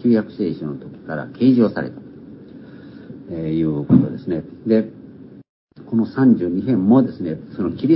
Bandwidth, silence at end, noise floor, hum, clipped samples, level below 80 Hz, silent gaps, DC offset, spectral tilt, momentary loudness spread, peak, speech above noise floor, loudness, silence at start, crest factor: 5.6 kHz; 0 s; -40 dBFS; none; under 0.1%; -50 dBFS; 5.49-5.67 s; under 0.1%; -13 dB/octave; 24 LU; 0 dBFS; 22 dB; -19 LUFS; 0 s; 18 dB